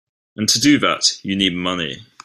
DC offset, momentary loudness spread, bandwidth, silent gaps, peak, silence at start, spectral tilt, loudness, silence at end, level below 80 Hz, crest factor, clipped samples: under 0.1%; 9 LU; 15.5 kHz; none; -2 dBFS; 0.4 s; -2.5 dB/octave; -17 LUFS; 0.25 s; -54 dBFS; 18 dB; under 0.1%